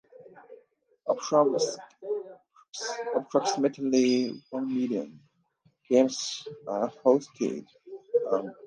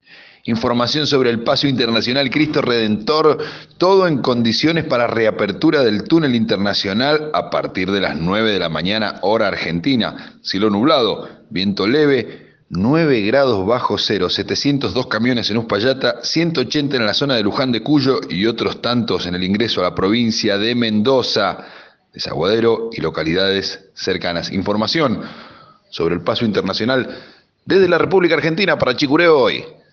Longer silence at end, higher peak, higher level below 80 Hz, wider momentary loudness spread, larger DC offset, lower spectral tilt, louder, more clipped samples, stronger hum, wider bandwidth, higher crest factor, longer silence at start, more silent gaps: second, 0 s vs 0.2 s; second, -8 dBFS vs -2 dBFS; second, -82 dBFS vs -52 dBFS; first, 15 LU vs 7 LU; neither; second, -4 dB/octave vs -5.5 dB/octave; second, -28 LUFS vs -17 LUFS; neither; neither; first, 10 kHz vs 7 kHz; about the same, 20 dB vs 16 dB; about the same, 0.2 s vs 0.1 s; first, 2.69-2.73 s vs none